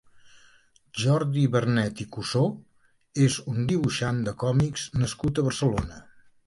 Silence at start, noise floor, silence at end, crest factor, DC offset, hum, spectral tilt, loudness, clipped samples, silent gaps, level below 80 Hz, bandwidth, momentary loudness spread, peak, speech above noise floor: 0.25 s; -59 dBFS; 0.45 s; 16 dB; under 0.1%; none; -6 dB/octave; -26 LUFS; under 0.1%; none; -48 dBFS; 11.5 kHz; 8 LU; -10 dBFS; 34 dB